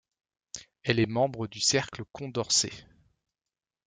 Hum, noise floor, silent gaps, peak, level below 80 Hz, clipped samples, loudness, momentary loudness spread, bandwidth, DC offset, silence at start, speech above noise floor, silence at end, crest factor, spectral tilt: none; under -90 dBFS; none; -8 dBFS; -64 dBFS; under 0.1%; -28 LUFS; 19 LU; 11 kHz; under 0.1%; 0.55 s; over 61 dB; 1.05 s; 22 dB; -3 dB/octave